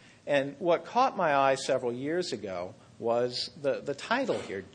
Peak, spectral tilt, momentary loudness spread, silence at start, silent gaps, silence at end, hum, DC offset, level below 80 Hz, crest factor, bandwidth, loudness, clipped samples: -12 dBFS; -4.5 dB/octave; 10 LU; 0.25 s; none; 0.05 s; none; under 0.1%; -72 dBFS; 18 dB; 10 kHz; -30 LUFS; under 0.1%